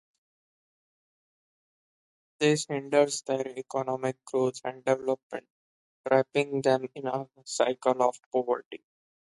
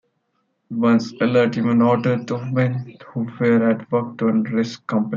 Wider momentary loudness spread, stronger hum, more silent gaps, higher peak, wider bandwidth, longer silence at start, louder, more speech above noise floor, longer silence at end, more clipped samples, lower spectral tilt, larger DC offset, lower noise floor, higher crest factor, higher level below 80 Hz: about the same, 10 LU vs 10 LU; neither; first, 5.23-5.30 s, 5.50-6.04 s, 8.26-8.32 s, 8.66-8.71 s vs none; second, -8 dBFS vs -4 dBFS; first, 11.5 kHz vs 7.2 kHz; first, 2.4 s vs 0.7 s; second, -29 LUFS vs -20 LUFS; first, over 62 dB vs 51 dB; first, 0.6 s vs 0 s; neither; second, -4.5 dB/octave vs -8 dB/octave; neither; first, under -90 dBFS vs -70 dBFS; first, 22 dB vs 16 dB; second, -78 dBFS vs -66 dBFS